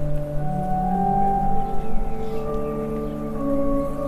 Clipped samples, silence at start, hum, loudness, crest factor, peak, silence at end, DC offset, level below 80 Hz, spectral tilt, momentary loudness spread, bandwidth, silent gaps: under 0.1%; 0 s; 50 Hz at -40 dBFS; -25 LUFS; 12 dB; -8 dBFS; 0 s; under 0.1%; -28 dBFS; -9 dB/octave; 8 LU; 4 kHz; none